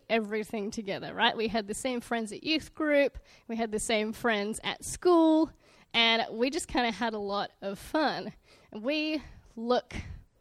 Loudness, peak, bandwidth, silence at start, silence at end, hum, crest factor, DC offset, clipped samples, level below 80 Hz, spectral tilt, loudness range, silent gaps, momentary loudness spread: -29 LUFS; -12 dBFS; 15 kHz; 0.1 s; 0.2 s; none; 18 dB; under 0.1%; under 0.1%; -56 dBFS; -3.5 dB/octave; 5 LU; none; 13 LU